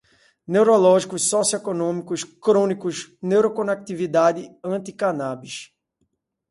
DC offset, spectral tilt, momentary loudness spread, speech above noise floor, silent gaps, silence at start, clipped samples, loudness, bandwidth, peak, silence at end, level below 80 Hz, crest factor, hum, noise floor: under 0.1%; -4.5 dB/octave; 13 LU; 52 dB; none; 0.5 s; under 0.1%; -21 LUFS; 11.5 kHz; -4 dBFS; 0.85 s; -68 dBFS; 18 dB; none; -72 dBFS